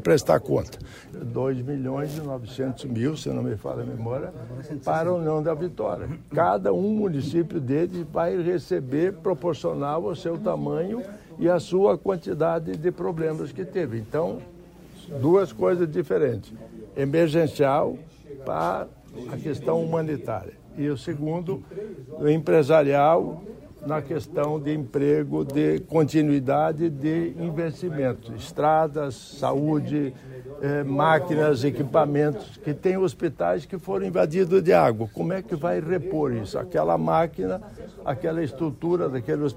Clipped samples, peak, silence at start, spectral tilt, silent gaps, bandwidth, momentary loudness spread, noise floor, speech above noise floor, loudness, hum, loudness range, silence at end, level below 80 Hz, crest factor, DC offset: under 0.1%; -4 dBFS; 0 s; -7.5 dB/octave; none; 16 kHz; 12 LU; -46 dBFS; 22 dB; -25 LUFS; none; 5 LU; 0 s; -54 dBFS; 20 dB; under 0.1%